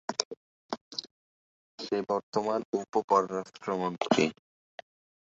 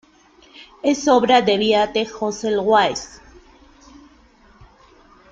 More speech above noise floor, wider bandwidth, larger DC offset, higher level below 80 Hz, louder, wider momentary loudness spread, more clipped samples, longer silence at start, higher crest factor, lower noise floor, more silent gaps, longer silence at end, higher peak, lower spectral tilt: first, over 61 dB vs 34 dB; about the same, 8 kHz vs 7.8 kHz; neither; second, -72 dBFS vs -54 dBFS; second, -31 LUFS vs -18 LUFS; first, 22 LU vs 10 LU; neither; second, 0.1 s vs 0.6 s; first, 28 dB vs 18 dB; first, under -90 dBFS vs -52 dBFS; first, 0.25-0.31 s, 0.37-0.69 s, 0.81-0.91 s, 1.11-1.78 s, 2.23-2.33 s, 2.65-2.73 s, 3.04-3.08 s vs none; second, 1 s vs 2.25 s; about the same, -4 dBFS vs -2 dBFS; about the same, -4 dB/octave vs -3.5 dB/octave